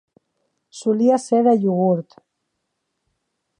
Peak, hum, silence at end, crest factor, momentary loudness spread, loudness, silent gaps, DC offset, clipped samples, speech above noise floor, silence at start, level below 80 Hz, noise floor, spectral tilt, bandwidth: -4 dBFS; none; 1.55 s; 16 dB; 7 LU; -18 LUFS; none; under 0.1%; under 0.1%; 58 dB; 0.75 s; -76 dBFS; -76 dBFS; -7.5 dB/octave; 10.5 kHz